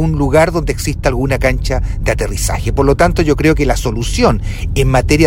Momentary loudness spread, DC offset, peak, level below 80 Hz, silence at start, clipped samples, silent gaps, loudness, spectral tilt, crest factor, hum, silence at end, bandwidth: 6 LU; under 0.1%; 0 dBFS; -20 dBFS; 0 s; under 0.1%; none; -14 LUFS; -5.5 dB/octave; 12 dB; none; 0 s; 16.5 kHz